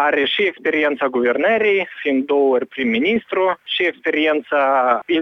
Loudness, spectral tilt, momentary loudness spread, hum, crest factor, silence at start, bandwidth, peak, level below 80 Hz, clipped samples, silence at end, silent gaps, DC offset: -18 LUFS; -6 dB/octave; 4 LU; none; 14 dB; 0 s; 6.2 kHz; -4 dBFS; -64 dBFS; under 0.1%; 0 s; none; under 0.1%